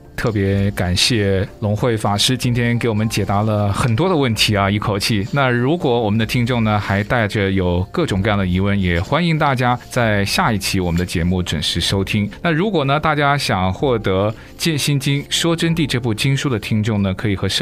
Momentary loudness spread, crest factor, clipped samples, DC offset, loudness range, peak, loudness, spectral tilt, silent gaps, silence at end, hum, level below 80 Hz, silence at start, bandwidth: 4 LU; 16 dB; under 0.1%; under 0.1%; 1 LU; -2 dBFS; -17 LUFS; -5 dB/octave; none; 0 s; none; -38 dBFS; 0.05 s; 16 kHz